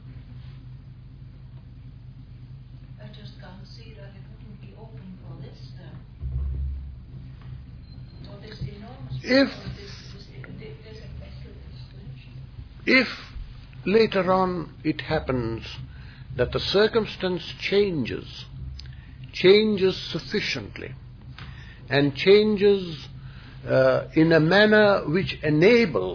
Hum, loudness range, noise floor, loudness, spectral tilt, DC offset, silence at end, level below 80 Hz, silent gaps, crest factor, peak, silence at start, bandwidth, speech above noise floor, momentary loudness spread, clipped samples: none; 22 LU; -43 dBFS; -22 LUFS; -6.5 dB/octave; under 0.1%; 0 s; -42 dBFS; none; 20 dB; -6 dBFS; 0 s; 5.4 kHz; 21 dB; 25 LU; under 0.1%